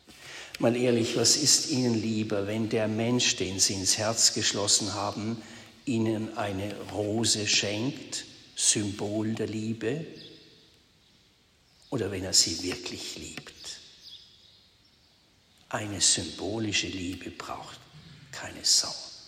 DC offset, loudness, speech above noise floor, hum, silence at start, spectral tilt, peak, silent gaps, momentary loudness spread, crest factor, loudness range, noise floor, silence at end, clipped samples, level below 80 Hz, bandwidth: under 0.1%; -26 LUFS; 35 dB; none; 0.1 s; -2.5 dB/octave; -8 dBFS; none; 18 LU; 22 dB; 7 LU; -63 dBFS; 0 s; under 0.1%; -64 dBFS; 16 kHz